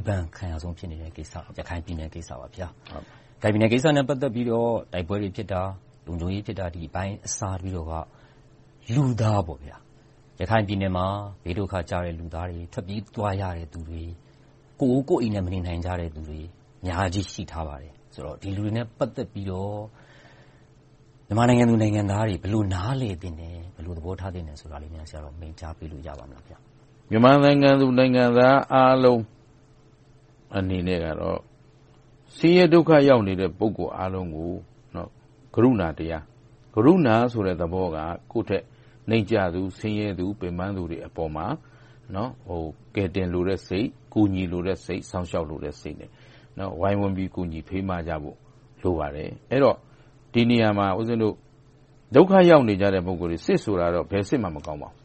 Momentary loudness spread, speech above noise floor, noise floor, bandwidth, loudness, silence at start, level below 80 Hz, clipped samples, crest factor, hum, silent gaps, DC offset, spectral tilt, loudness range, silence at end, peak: 21 LU; 31 dB; -54 dBFS; 8.4 kHz; -24 LUFS; 0 s; -46 dBFS; under 0.1%; 22 dB; none; none; under 0.1%; -7 dB/octave; 11 LU; 0.15 s; -2 dBFS